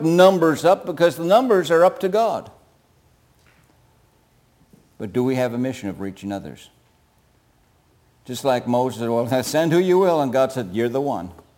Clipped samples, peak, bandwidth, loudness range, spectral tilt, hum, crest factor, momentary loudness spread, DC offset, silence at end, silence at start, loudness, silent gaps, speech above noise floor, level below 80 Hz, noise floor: under 0.1%; -2 dBFS; 17 kHz; 10 LU; -6 dB/octave; none; 18 dB; 14 LU; under 0.1%; 0.25 s; 0 s; -20 LUFS; none; 40 dB; -62 dBFS; -59 dBFS